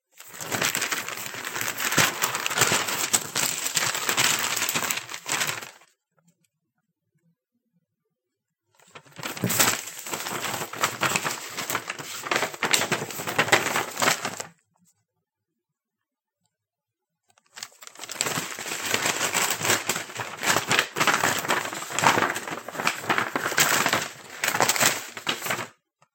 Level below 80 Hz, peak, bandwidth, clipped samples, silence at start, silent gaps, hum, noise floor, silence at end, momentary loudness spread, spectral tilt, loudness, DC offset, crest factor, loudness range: -76 dBFS; 0 dBFS; 17 kHz; under 0.1%; 0.2 s; none; none; -86 dBFS; 0.45 s; 12 LU; -1 dB/octave; -24 LUFS; under 0.1%; 28 dB; 9 LU